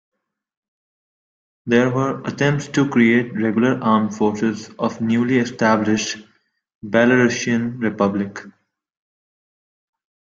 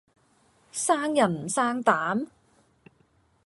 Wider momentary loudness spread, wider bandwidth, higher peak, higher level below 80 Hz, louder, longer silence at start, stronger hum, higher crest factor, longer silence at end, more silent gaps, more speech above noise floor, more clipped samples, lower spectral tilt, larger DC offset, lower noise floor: about the same, 10 LU vs 9 LU; second, 7.6 kHz vs 11.5 kHz; first, -2 dBFS vs -6 dBFS; first, -60 dBFS vs -70 dBFS; first, -19 LUFS vs -25 LUFS; first, 1.65 s vs 0.75 s; neither; about the same, 18 dB vs 22 dB; first, 1.7 s vs 1.2 s; first, 6.75-6.81 s vs none; first, over 72 dB vs 40 dB; neither; first, -5.5 dB/octave vs -4 dB/octave; neither; first, under -90 dBFS vs -65 dBFS